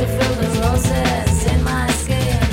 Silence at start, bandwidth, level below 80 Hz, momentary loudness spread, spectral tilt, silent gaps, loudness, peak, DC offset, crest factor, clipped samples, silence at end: 0 s; 16.5 kHz; -24 dBFS; 1 LU; -5 dB/octave; none; -18 LUFS; -4 dBFS; under 0.1%; 14 dB; under 0.1%; 0 s